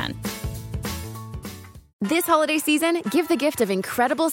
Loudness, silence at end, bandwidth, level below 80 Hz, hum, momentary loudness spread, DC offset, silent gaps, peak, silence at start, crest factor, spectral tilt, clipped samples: -23 LUFS; 0 s; 17 kHz; -44 dBFS; none; 16 LU; under 0.1%; 1.93-1.99 s; -6 dBFS; 0 s; 18 dB; -4.5 dB/octave; under 0.1%